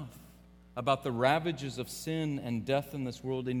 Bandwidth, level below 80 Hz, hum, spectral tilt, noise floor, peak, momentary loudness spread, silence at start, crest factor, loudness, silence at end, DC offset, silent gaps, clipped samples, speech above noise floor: 19 kHz; -60 dBFS; none; -5.5 dB/octave; -57 dBFS; -12 dBFS; 10 LU; 0 s; 22 dB; -33 LUFS; 0 s; under 0.1%; none; under 0.1%; 24 dB